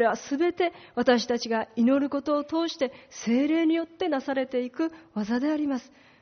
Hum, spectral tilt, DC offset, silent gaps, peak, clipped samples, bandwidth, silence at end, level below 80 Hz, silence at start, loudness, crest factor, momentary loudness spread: none; -3 dB/octave; under 0.1%; none; -10 dBFS; under 0.1%; 6.6 kHz; 0.4 s; -68 dBFS; 0 s; -27 LUFS; 16 dB; 8 LU